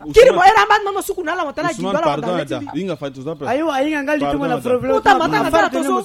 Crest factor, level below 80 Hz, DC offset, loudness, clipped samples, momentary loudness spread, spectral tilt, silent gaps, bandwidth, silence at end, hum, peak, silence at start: 16 dB; -44 dBFS; under 0.1%; -16 LUFS; under 0.1%; 13 LU; -4.5 dB/octave; none; 16.5 kHz; 0 s; none; 0 dBFS; 0 s